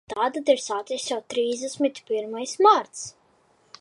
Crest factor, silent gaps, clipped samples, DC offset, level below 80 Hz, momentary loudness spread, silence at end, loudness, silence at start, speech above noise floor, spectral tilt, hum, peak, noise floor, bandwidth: 20 dB; none; under 0.1%; under 0.1%; -72 dBFS; 13 LU; 0.7 s; -24 LUFS; 0.1 s; 38 dB; -2 dB/octave; none; -6 dBFS; -62 dBFS; 11.5 kHz